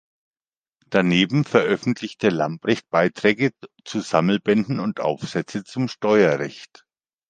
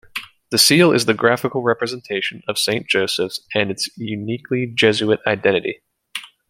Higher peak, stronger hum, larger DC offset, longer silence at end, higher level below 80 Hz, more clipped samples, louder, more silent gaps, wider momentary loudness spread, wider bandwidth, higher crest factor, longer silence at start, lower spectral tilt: about the same, -2 dBFS vs 0 dBFS; neither; neither; first, 0.65 s vs 0.25 s; about the same, -62 dBFS vs -62 dBFS; neither; second, -21 LUFS vs -18 LUFS; neither; second, 10 LU vs 15 LU; second, 9.4 kHz vs 16.5 kHz; about the same, 20 dB vs 18 dB; first, 0.9 s vs 0.15 s; first, -6 dB/octave vs -3.5 dB/octave